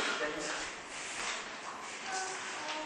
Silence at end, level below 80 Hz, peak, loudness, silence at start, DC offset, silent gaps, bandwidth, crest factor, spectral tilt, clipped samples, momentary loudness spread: 0 s; -68 dBFS; -22 dBFS; -38 LUFS; 0 s; under 0.1%; none; 11.5 kHz; 18 dB; -0.5 dB/octave; under 0.1%; 7 LU